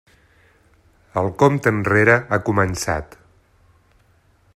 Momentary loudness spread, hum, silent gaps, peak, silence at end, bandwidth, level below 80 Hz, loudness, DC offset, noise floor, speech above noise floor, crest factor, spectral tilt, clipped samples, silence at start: 10 LU; none; none; 0 dBFS; 1.5 s; 14 kHz; -48 dBFS; -18 LUFS; under 0.1%; -57 dBFS; 39 dB; 20 dB; -6 dB/octave; under 0.1%; 1.15 s